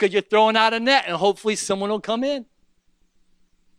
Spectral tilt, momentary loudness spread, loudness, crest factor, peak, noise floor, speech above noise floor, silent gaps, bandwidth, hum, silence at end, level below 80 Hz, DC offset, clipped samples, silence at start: -3 dB/octave; 7 LU; -20 LUFS; 20 dB; -2 dBFS; -62 dBFS; 42 dB; none; 12 kHz; none; 1.35 s; -64 dBFS; under 0.1%; under 0.1%; 0 s